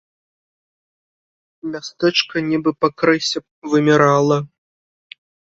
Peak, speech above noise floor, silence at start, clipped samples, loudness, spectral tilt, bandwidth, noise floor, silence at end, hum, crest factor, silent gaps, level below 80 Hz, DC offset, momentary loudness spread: 0 dBFS; over 73 dB; 1.65 s; under 0.1%; -17 LUFS; -5 dB/octave; 7.8 kHz; under -90 dBFS; 1.15 s; none; 20 dB; 3.51-3.62 s; -60 dBFS; under 0.1%; 15 LU